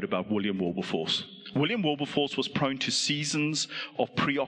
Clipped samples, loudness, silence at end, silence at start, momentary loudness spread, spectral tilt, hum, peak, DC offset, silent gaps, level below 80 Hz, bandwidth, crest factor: under 0.1%; -29 LUFS; 0 s; 0 s; 4 LU; -4 dB/octave; none; -12 dBFS; under 0.1%; none; -68 dBFS; 10.5 kHz; 18 dB